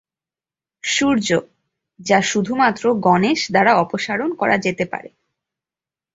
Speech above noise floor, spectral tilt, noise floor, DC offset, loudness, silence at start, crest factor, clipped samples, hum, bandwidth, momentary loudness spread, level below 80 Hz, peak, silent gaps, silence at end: over 72 dB; -4 dB/octave; under -90 dBFS; under 0.1%; -18 LUFS; 0.85 s; 18 dB; under 0.1%; none; 8 kHz; 9 LU; -58 dBFS; -2 dBFS; none; 1.05 s